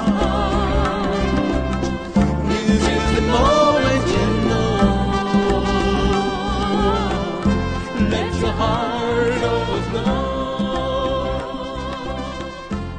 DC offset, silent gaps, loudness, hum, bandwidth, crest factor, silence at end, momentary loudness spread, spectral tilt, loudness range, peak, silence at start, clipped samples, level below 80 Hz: under 0.1%; none; -19 LUFS; none; 10 kHz; 16 dB; 0 s; 8 LU; -6 dB/octave; 4 LU; -2 dBFS; 0 s; under 0.1%; -28 dBFS